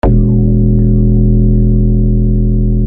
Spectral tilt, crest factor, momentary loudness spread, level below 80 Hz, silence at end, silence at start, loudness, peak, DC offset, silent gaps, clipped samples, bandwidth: -13 dB/octave; 8 dB; 2 LU; -12 dBFS; 0 s; 0.05 s; -11 LUFS; 0 dBFS; under 0.1%; none; under 0.1%; 2.8 kHz